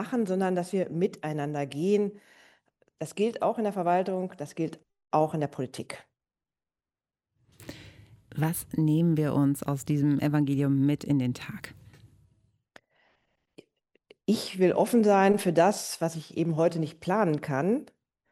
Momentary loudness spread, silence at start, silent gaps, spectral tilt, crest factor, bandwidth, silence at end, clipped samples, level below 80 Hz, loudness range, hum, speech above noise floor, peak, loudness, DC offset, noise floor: 14 LU; 0 s; none; -6.5 dB/octave; 18 dB; 16 kHz; 0.45 s; under 0.1%; -66 dBFS; 10 LU; none; over 63 dB; -10 dBFS; -27 LUFS; under 0.1%; under -90 dBFS